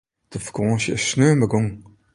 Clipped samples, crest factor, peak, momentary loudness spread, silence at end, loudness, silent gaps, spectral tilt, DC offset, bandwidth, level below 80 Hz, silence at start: under 0.1%; 18 dB; -4 dBFS; 15 LU; 0.35 s; -20 LUFS; none; -5.5 dB/octave; under 0.1%; 11.5 kHz; -50 dBFS; 0.3 s